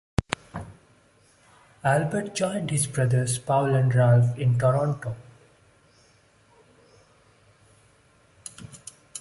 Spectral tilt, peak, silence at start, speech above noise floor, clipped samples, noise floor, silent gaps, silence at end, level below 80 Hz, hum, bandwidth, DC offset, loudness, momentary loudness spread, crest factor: -6 dB/octave; 0 dBFS; 0.2 s; 37 dB; under 0.1%; -60 dBFS; none; 0 s; -50 dBFS; none; 11.5 kHz; under 0.1%; -24 LUFS; 22 LU; 26 dB